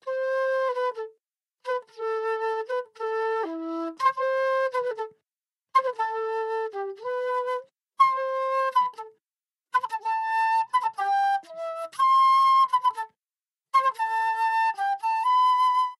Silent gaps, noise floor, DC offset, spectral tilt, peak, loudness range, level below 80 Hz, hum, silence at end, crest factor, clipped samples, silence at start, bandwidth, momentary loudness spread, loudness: none; under -90 dBFS; under 0.1%; -2 dB/octave; -8 dBFS; 6 LU; under -90 dBFS; none; 0.05 s; 16 dB; under 0.1%; 0.05 s; 12.5 kHz; 12 LU; -25 LUFS